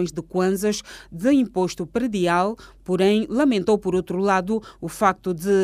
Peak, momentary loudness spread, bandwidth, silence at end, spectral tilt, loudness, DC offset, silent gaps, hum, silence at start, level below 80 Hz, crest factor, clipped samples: -4 dBFS; 8 LU; 15.5 kHz; 0 s; -5.5 dB/octave; -22 LUFS; under 0.1%; none; none; 0 s; -50 dBFS; 18 dB; under 0.1%